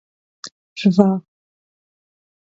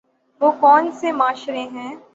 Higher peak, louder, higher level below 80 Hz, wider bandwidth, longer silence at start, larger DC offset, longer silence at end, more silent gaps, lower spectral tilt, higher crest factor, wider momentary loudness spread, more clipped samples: about the same, 0 dBFS vs -2 dBFS; about the same, -17 LUFS vs -17 LUFS; first, -62 dBFS vs -72 dBFS; about the same, 7.8 kHz vs 7.8 kHz; about the same, 0.45 s vs 0.4 s; neither; first, 1.25 s vs 0.15 s; first, 0.52-0.76 s vs none; first, -7.5 dB/octave vs -4 dB/octave; about the same, 22 dB vs 18 dB; first, 23 LU vs 15 LU; neither